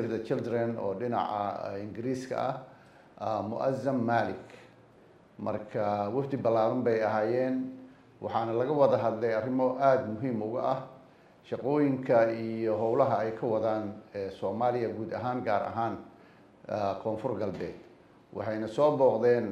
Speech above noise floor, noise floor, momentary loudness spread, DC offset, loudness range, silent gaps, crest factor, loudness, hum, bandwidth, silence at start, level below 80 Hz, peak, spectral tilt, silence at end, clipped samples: 29 dB; -58 dBFS; 13 LU; under 0.1%; 5 LU; none; 20 dB; -30 LUFS; none; 9.8 kHz; 0 s; -72 dBFS; -10 dBFS; -8 dB/octave; 0 s; under 0.1%